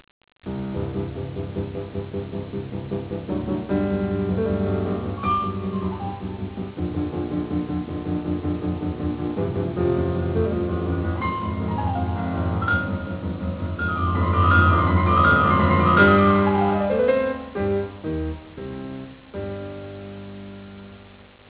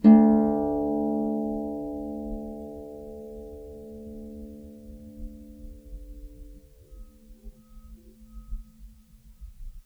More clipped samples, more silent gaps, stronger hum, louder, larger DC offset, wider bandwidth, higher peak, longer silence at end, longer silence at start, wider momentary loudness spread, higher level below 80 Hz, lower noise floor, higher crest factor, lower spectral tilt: neither; neither; neither; about the same, -23 LUFS vs -25 LUFS; neither; first, 4 kHz vs 2.8 kHz; about the same, -4 dBFS vs -6 dBFS; first, 0.25 s vs 0.05 s; first, 0.45 s vs 0 s; second, 17 LU vs 23 LU; first, -34 dBFS vs -44 dBFS; second, -47 dBFS vs -52 dBFS; about the same, 20 dB vs 22 dB; about the same, -11 dB/octave vs -10 dB/octave